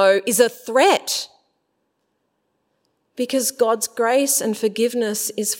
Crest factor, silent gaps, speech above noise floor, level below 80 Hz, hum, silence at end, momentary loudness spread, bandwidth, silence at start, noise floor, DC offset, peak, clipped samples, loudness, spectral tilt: 20 dB; none; 52 dB; -80 dBFS; none; 0 s; 9 LU; 16.5 kHz; 0 s; -71 dBFS; under 0.1%; -2 dBFS; under 0.1%; -19 LUFS; -2 dB/octave